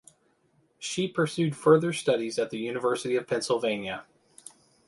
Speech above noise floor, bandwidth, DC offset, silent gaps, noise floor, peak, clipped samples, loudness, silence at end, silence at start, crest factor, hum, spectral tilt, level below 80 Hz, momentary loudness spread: 41 dB; 11.5 kHz; under 0.1%; none; -68 dBFS; -8 dBFS; under 0.1%; -27 LUFS; 0.85 s; 0.8 s; 20 dB; none; -5 dB/octave; -70 dBFS; 17 LU